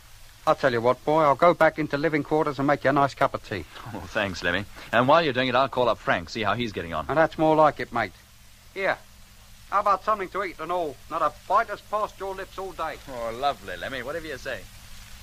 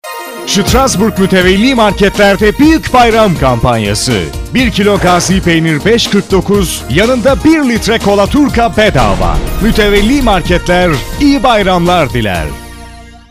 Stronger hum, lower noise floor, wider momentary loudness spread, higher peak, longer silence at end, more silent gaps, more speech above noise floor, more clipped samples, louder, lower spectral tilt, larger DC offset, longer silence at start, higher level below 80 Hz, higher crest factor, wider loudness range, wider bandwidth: neither; first, -50 dBFS vs -31 dBFS; first, 14 LU vs 6 LU; second, -6 dBFS vs 0 dBFS; second, 0 s vs 0.2 s; neither; first, 26 dB vs 22 dB; second, under 0.1% vs 0.1%; second, -25 LUFS vs -9 LUFS; about the same, -5.5 dB/octave vs -5 dB/octave; neither; first, 0.2 s vs 0.05 s; second, -50 dBFS vs -20 dBFS; first, 20 dB vs 8 dB; first, 6 LU vs 2 LU; about the same, 15.5 kHz vs 16 kHz